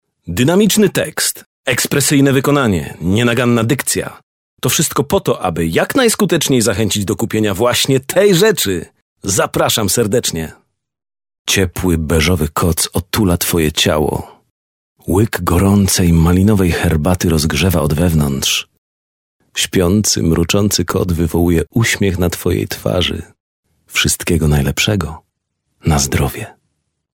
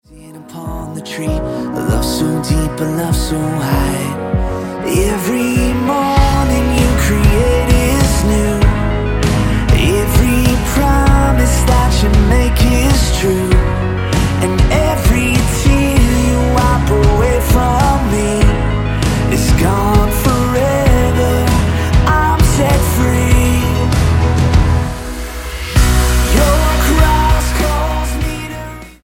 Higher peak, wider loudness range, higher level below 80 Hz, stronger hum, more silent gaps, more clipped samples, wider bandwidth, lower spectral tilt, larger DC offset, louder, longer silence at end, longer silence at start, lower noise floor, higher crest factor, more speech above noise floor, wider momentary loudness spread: about the same, 0 dBFS vs 0 dBFS; about the same, 3 LU vs 4 LU; second, -30 dBFS vs -16 dBFS; neither; first, 1.46-1.64 s, 4.23-4.57 s, 9.02-9.16 s, 11.39-11.45 s, 14.50-14.96 s, 18.78-19.40 s, 23.40-23.63 s vs none; neither; about the same, 17.5 kHz vs 17 kHz; about the same, -4.5 dB/octave vs -5.5 dB/octave; neither; about the same, -14 LUFS vs -13 LUFS; first, 0.6 s vs 0.15 s; about the same, 0.25 s vs 0.15 s; first, -71 dBFS vs -35 dBFS; about the same, 14 dB vs 12 dB; first, 57 dB vs 20 dB; about the same, 7 LU vs 7 LU